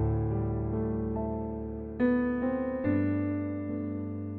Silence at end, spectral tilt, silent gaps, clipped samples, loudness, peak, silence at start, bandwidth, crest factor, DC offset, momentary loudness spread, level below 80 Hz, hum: 0 s; -10 dB/octave; none; under 0.1%; -31 LUFS; -16 dBFS; 0 s; 4.2 kHz; 14 dB; under 0.1%; 7 LU; -44 dBFS; none